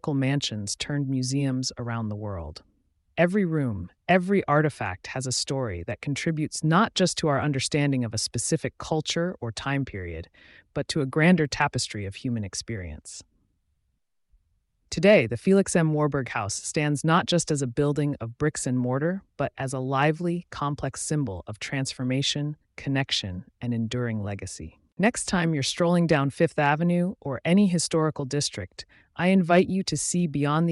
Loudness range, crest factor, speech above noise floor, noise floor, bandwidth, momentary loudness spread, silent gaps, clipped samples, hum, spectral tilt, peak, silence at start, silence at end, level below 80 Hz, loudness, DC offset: 5 LU; 18 dB; 48 dB; -74 dBFS; 11.5 kHz; 13 LU; 24.93-24.97 s; under 0.1%; none; -5 dB/octave; -8 dBFS; 0.05 s; 0 s; -54 dBFS; -25 LUFS; under 0.1%